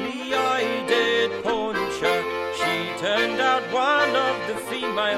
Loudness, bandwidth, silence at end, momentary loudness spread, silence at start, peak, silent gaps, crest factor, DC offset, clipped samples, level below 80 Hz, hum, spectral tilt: -23 LUFS; 16 kHz; 0 s; 6 LU; 0 s; -8 dBFS; none; 16 dB; under 0.1%; under 0.1%; -60 dBFS; none; -3 dB/octave